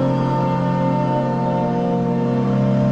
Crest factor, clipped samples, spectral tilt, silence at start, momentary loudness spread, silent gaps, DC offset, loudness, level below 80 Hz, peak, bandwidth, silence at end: 10 dB; under 0.1%; -9.5 dB/octave; 0 s; 2 LU; none; under 0.1%; -19 LUFS; -46 dBFS; -8 dBFS; 7.6 kHz; 0 s